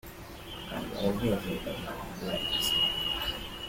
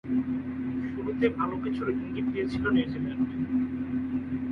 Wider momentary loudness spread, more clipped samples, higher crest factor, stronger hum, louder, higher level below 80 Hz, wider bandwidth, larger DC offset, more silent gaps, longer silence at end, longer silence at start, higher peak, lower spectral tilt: first, 15 LU vs 6 LU; neither; about the same, 16 dB vs 16 dB; neither; about the same, -30 LUFS vs -30 LUFS; about the same, -48 dBFS vs -52 dBFS; first, 16.5 kHz vs 5.4 kHz; neither; neither; about the same, 0 s vs 0 s; about the same, 0.05 s vs 0.05 s; second, -16 dBFS vs -12 dBFS; second, -4 dB/octave vs -8.5 dB/octave